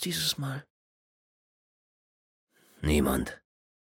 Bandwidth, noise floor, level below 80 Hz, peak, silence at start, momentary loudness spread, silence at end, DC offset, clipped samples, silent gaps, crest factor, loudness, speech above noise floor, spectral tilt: 17 kHz; under -90 dBFS; -44 dBFS; -14 dBFS; 0 s; 14 LU; 0.45 s; under 0.1%; under 0.1%; 0.70-2.47 s; 20 dB; -29 LUFS; over 61 dB; -4.5 dB/octave